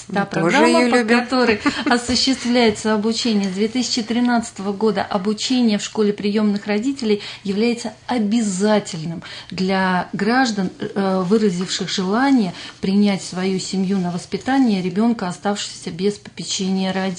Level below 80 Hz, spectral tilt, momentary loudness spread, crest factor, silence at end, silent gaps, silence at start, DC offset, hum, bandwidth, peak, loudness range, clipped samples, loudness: -56 dBFS; -4.5 dB/octave; 8 LU; 16 dB; 0 s; none; 0 s; under 0.1%; none; 10.5 kHz; -2 dBFS; 4 LU; under 0.1%; -19 LUFS